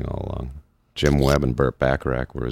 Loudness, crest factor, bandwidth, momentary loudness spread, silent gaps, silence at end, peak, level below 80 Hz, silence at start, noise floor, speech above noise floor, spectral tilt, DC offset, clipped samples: -22 LUFS; 20 dB; 16 kHz; 14 LU; none; 0 s; -2 dBFS; -32 dBFS; 0 s; -41 dBFS; 21 dB; -6.5 dB/octave; under 0.1%; under 0.1%